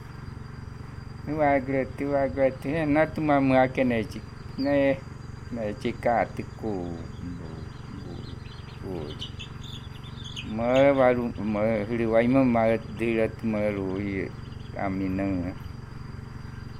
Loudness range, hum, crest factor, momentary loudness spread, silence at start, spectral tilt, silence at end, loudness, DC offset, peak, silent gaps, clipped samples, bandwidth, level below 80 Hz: 12 LU; none; 18 dB; 19 LU; 0 s; -7.5 dB/octave; 0 s; -26 LUFS; under 0.1%; -8 dBFS; none; under 0.1%; 12 kHz; -46 dBFS